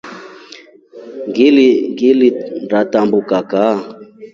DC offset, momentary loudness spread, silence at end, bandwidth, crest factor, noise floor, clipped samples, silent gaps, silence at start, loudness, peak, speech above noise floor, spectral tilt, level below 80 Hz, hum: under 0.1%; 23 LU; 0.1 s; 7.2 kHz; 14 dB; -39 dBFS; under 0.1%; none; 0.05 s; -13 LUFS; 0 dBFS; 27 dB; -6.5 dB/octave; -62 dBFS; none